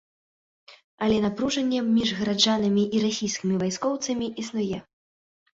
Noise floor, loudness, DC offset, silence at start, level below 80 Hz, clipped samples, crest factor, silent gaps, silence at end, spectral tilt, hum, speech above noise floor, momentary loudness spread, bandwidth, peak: under -90 dBFS; -25 LUFS; under 0.1%; 0.7 s; -58 dBFS; under 0.1%; 20 dB; 0.84-0.98 s; 0.8 s; -4.5 dB/octave; none; over 66 dB; 8 LU; 7.8 kHz; -6 dBFS